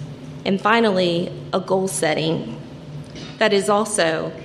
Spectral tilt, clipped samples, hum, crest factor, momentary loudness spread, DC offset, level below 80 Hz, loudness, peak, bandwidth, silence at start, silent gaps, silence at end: -4 dB/octave; under 0.1%; none; 18 dB; 18 LU; under 0.1%; -56 dBFS; -20 LUFS; -2 dBFS; 14 kHz; 0 s; none; 0 s